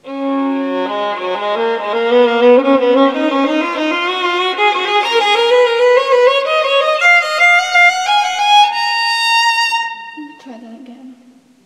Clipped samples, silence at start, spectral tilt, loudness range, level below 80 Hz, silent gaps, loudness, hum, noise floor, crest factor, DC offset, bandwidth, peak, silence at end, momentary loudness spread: under 0.1%; 0.05 s; -1.5 dB/octave; 3 LU; -70 dBFS; none; -12 LUFS; none; -46 dBFS; 14 dB; under 0.1%; 14.5 kHz; 0 dBFS; 0.55 s; 9 LU